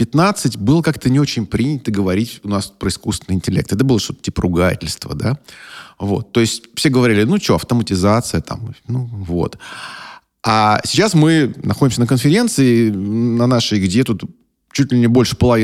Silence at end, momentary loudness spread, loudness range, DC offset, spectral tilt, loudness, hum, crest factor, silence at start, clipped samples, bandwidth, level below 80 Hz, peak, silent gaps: 0 s; 11 LU; 5 LU; under 0.1%; -5.5 dB/octave; -16 LUFS; none; 14 dB; 0 s; under 0.1%; 15.5 kHz; -40 dBFS; 0 dBFS; none